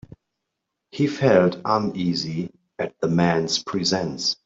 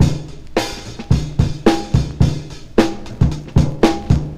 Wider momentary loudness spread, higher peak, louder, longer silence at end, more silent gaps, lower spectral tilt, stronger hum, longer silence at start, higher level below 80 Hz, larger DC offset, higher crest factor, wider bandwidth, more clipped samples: first, 13 LU vs 8 LU; second, -4 dBFS vs 0 dBFS; second, -22 LUFS vs -18 LUFS; about the same, 0.1 s vs 0 s; neither; second, -5 dB/octave vs -6.5 dB/octave; neither; first, 0.95 s vs 0 s; second, -58 dBFS vs -26 dBFS; neither; about the same, 20 dB vs 16 dB; second, 7.8 kHz vs 14.5 kHz; neither